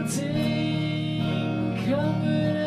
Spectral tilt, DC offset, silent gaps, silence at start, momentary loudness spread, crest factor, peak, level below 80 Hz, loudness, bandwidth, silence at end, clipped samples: -6 dB/octave; under 0.1%; none; 0 s; 2 LU; 12 dB; -12 dBFS; -52 dBFS; -26 LUFS; 15 kHz; 0 s; under 0.1%